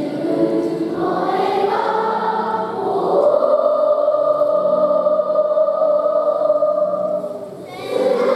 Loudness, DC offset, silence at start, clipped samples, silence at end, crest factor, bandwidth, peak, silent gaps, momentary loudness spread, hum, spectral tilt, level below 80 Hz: -17 LUFS; under 0.1%; 0 s; under 0.1%; 0 s; 14 dB; 11.5 kHz; -4 dBFS; none; 6 LU; none; -7 dB/octave; -66 dBFS